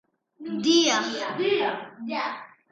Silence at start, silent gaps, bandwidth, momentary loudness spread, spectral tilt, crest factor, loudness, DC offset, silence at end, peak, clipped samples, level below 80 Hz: 0.4 s; none; 7.8 kHz; 15 LU; -2.5 dB/octave; 18 dB; -25 LUFS; under 0.1%; 0.25 s; -8 dBFS; under 0.1%; -76 dBFS